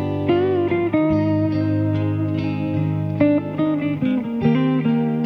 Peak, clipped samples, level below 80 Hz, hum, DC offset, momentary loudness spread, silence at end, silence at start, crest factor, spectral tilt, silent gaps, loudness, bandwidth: -6 dBFS; under 0.1%; -50 dBFS; none; under 0.1%; 4 LU; 0 s; 0 s; 14 dB; -10 dB/octave; none; -20 LUFS; 5.8 kHz